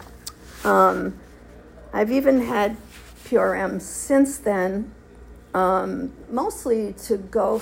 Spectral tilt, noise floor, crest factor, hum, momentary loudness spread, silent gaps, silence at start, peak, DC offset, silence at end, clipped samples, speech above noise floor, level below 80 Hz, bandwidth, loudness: -5.5 dB/octave; -45 dBFS; 18 dB; none; 16 LU; none; 0 s; -4 dBFS; under 0.1%; 0 s; under 0.1%; 24 dB; -48 dBFS; 16.5 kHz; -22 LUFS